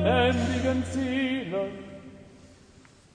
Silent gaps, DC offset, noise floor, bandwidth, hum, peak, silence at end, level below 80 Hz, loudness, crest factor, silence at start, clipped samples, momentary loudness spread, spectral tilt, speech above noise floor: none; under 0.1%; -55 dBFS; 10 kHz; none; -10 dBFS; 0.7 s; -50 dBFS; -27 LUFS; 18 dB; 0 s; under 0.1%; 21 LU; -6 dB/octave; 27 dB